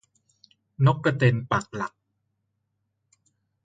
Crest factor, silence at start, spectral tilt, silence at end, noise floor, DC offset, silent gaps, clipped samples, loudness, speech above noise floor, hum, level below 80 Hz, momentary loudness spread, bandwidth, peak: 20 dB; 0.8 s; -7 dB/octave; 1.8 s; -77 dBFS; under 0.1%; none; under 0.1%; -24 LUFS; 54 dB; none; -60 dBFS; 12 LU; 7.8 kHz; -8 dBFS